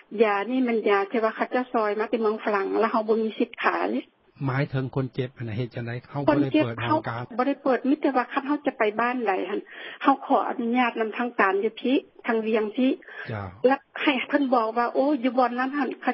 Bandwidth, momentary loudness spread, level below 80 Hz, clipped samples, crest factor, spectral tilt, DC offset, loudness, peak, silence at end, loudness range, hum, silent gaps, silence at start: 5.8 kHz; 9 LU; -64 dBFS; under 0.1%; 20 dB; -11 dB/octave; under 0.1%; -25 LUFS; -4 dBFS; 0 s; 2 LU; none; none; 0.1 s